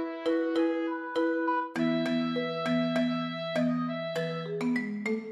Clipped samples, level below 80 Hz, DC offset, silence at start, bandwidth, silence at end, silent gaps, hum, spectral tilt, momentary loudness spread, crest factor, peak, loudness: under 0.1%; -80 dBFS; under 0.1%; 0 s; 11 kHz; 0 s; none; none; -6.5 dB/octave; 4 LU; 12 dB; -16 dBFS; -30 LUFS